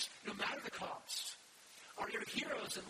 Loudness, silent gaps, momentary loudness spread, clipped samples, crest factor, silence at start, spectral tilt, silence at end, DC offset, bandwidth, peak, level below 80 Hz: -43 LUFS; none; 14 LU; under 0.1%; 20 dB; 0 s; -1.5 dB/octave; 0 s; under 0.1%; 15 kHz; -26 dBFS; -80 dBFS